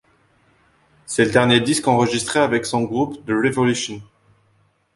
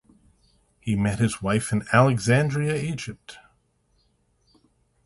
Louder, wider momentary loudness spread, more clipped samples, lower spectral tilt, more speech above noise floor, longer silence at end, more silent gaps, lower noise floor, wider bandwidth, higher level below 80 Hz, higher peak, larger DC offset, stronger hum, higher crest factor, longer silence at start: first, -19 LUFS vs -23 LUFS; second, 9 LU vs 17 LU; neither; second, -4.5 dB/octave vs -6 dB/octave; about the same, 43 dB vs 44 dB; second, 0.9 s vs 1.7 s; neither; second, -61 dBFS vs -67 dBFS; about the same, 11.5 kHz vs 11.5 kHz; about the same, -54 dBFS vs -52 dBFS; about the same, -2 dBFS vs -4 dBFS; neither; neither; about the same, 20 dB vs 22 dB; first, 1.1 s vs 0.85 s